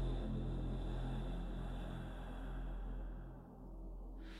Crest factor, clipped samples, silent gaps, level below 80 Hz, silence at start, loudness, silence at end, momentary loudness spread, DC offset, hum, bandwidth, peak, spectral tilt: 12 dB; under 0.1%; none; -46 dBFS; 0 s; -47 LUFS; 0 s; 10 LU; under 0.1%; none; 9.4 kHz; -30 dBFS; -8 dB/octave